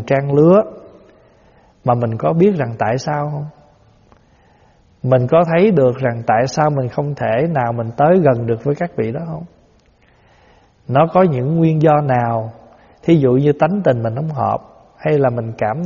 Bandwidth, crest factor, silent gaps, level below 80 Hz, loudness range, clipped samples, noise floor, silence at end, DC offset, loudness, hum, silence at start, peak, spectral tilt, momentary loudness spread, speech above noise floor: 7.2 kHz; 16 dB; none; -52 dBFS; 4 LU; under 0.1%; -52 dBFS; 0 s; under 0.1%; -16 LUFS; none; 0 s; 0 dBFS; -7.5 dB/octave; 11 LU; 38 dB